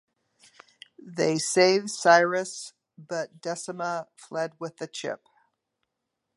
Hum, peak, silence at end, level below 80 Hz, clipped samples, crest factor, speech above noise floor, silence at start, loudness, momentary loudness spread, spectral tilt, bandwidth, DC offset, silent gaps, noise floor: none; -4 dBFS; 1.2 s; -80 dBFS; under 0.1%; 24 dB; 56 dB; 1 s; -26 LUFS; 17 LU; -3.5 dB/octave; 11.5 kHz; under 0.1%; none; -82 dBFS